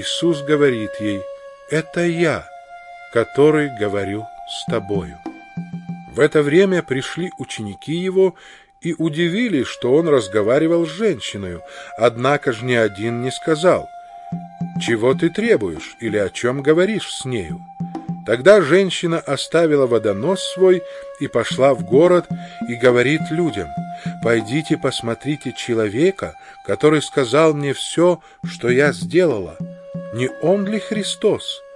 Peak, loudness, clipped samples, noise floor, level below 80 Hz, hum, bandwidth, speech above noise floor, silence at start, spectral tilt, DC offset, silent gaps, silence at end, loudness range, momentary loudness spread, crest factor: 0 dBFS; -18 LUFS; under 0.1%; -38 dBFS; -56 dBFS; none; 11.5 kHz; 21 dB; 0 s; -5.5 dB/octave; under 0.1%; none; 0 s; 4 LU; 15 LU; 18 dB